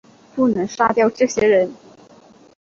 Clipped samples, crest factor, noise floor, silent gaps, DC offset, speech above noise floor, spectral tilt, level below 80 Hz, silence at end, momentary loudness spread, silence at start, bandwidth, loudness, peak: under 0.1%; 18 dB; -48 dBFS; none; under 0.1%; 31 dB; -5 dB/octave; -56 dBFS; 0.9 s; 7 LU; 0.35 s; 7.6 kHz; -18 LUFS; -2 dBFS